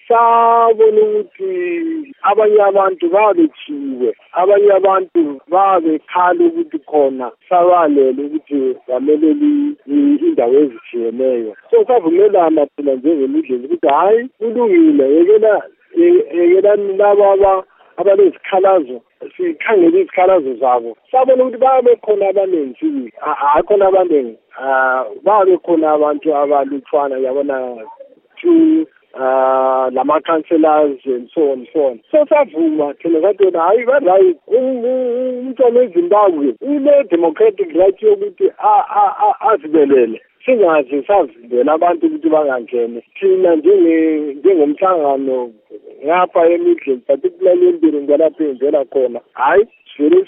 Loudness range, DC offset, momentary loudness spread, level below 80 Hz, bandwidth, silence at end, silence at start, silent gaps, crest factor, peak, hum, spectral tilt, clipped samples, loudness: 2 LU; under 0.1%; 9 LU; -58 dBFS; 3.7 kHz; 0.05 s; 0.1 s; none; 12 dB; 0 dBFS; none; -10.5 dB/octave; under 0.1%; -13 LUFS